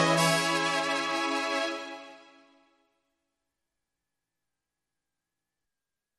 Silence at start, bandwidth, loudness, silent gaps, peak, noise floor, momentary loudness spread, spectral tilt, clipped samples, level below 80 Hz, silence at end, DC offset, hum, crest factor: 0 s; 13 kHz; -27 LUFS; none; -10 dBFS; -89 dBFS; 15 LU; -3 dB/octave; under 0.1%; -78 dBFS; 4 s; under 0.1%; none; 22 dB